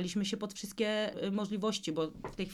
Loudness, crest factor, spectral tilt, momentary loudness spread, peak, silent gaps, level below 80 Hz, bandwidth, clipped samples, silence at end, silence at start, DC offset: -35 LUFS; 16 dB; -4.5 dB/octave; 6 LU; -20 dBFS; none; -62 dBFS; 14 kHz; under 0.1%; 0 s; 0 s; under 0.1%